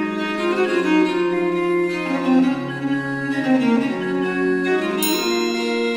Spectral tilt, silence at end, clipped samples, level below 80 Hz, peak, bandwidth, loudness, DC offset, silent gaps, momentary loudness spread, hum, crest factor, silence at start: -5 dB/octave; 0 s; under 0.1%; -58 dBFS; -6 dBFS; 16 kHz; -20 LUFS; under 0.1%; none; 5 LU; none; 14 dB; 0 s